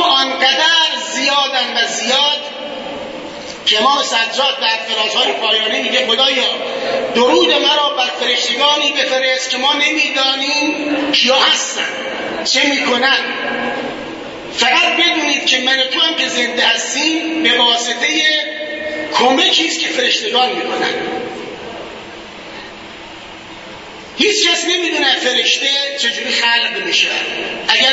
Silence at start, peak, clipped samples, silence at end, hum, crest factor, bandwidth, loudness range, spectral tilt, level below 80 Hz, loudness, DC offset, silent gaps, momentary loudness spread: 0 s; 0 dBFS; under 0.1%; 0 s; none; 16 dB; 8 kHz; 4 LU; -0.5 dB/octave; -56 dBFS; -13 LUFS; under 0.1%; none; 16 LU